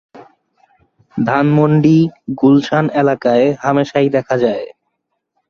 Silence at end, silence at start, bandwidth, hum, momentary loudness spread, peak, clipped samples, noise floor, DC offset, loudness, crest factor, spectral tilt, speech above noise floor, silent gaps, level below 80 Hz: 0.8 s; 0.15 s; 7 kHz; none; 8 LU; -2 dBFS; under 0.1%; -71 dBFS; under 0.1%; -14 LUFS; 14 dB; -8 dB/octave; 58 dB; none; -54 dBFS